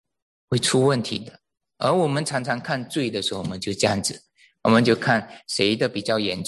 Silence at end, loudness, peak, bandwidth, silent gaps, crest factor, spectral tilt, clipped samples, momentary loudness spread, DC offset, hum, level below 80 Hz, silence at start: 0 s; -23 LUFS; -4 dBFS; 12.5 kHz; none; 20 dB; -4.5 dB/octave; under 0.1%; 10 LU; under 0.1%; none; -58 dBFS; 0.5 s